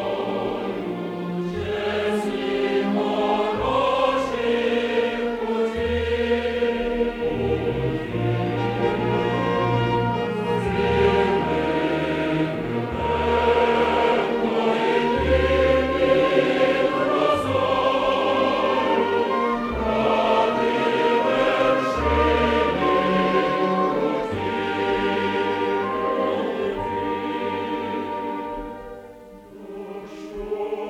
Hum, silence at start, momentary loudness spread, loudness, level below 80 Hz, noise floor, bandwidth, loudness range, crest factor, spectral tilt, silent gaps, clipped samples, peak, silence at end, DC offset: none; 0 s; 8 LU; -22 LUFS; -40 dBFS; -43 dBFS; 13 kHz; 5 LU; 16 dB; -6.5 dB/octave; none; under 0.1%; -6 dBFS; 0 s; under 0.1%